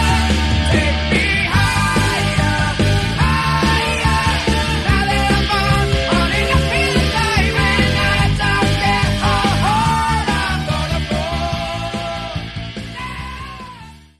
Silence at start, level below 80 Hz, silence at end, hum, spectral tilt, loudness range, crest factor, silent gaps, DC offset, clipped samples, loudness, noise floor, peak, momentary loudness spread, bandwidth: 0 s; -24 dBFS; 0.2 s; none; -5 dB/octave; 5 LU; 16 dB; none; under 0.1%; under 0.1%; -16 LUFS; -38 dBFS; -2 dBFS; 11 LU; 13.5 kHz